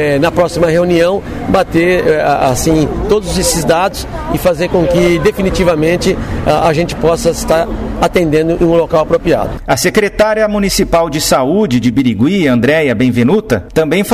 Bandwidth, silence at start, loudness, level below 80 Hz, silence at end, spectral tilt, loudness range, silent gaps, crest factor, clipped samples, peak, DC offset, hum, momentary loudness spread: 16 kHz; 0 s; -12 LUFS; -28 dBFS; 0 s; -5 dB/octave; 1 LU; none; 10 dB; under 0.1%; 0 dBFS; 0.4%; none; 4 LU